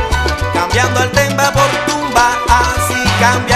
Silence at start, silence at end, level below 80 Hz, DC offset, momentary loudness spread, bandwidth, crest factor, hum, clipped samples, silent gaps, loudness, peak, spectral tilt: 0 s; 0 s; -24 dBFS; under 0.1%; 4 LU; 14.5 kHz; 12 dB; none; 0.1%; none; -12 LUFS; 0 dBFS; -3.5 dB/octave